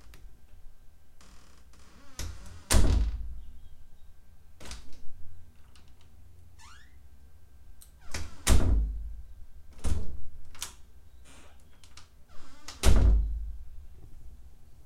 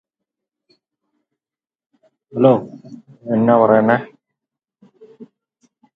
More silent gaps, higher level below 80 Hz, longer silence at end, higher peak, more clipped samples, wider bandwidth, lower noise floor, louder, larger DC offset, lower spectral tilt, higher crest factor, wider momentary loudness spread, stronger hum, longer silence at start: neither; first, -34 dBFS vs -66 dBFS; second, 0.5 s vs 0.7 s; second, -6 dBFS vs 0 dBFS; neither; first, 15.5 kHz vs 4.7 kHz; second, -54 dBFS vs under -90 dBFS; second, -31 LUFS vs -15 LUFS; first, 0.4% vs under 0.1%; second, -4.5 dB/octave vs -10 dB/octave; about the same, 22 dB vs 20 dB; first, 29 LU vs 24 LU; neither; second, 0.1 s vs 2.35 s